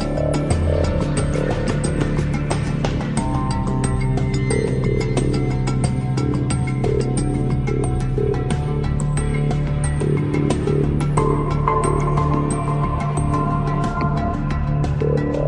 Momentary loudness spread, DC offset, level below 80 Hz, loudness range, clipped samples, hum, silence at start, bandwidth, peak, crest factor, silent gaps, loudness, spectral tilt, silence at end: 3 LU; under 0.1%; -28 dBFS; 1 LU; under 0.1%; none; 0 s; 10.5 kHz; -4 dBFS; 14 dB; none; -20 LUFS; -7 dB/octave; 0 s